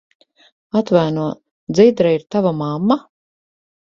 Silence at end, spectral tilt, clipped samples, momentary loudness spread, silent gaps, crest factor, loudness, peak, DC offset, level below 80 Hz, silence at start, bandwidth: 0.95 s; -7.5 dB/octave; under 0.1%; 10 LU; 1.51-1.67 s; 18 dB; -17 LUFS; 0 dBFS; under 0.1%; -58 dBFS; 0.75 s; 7.6 kHz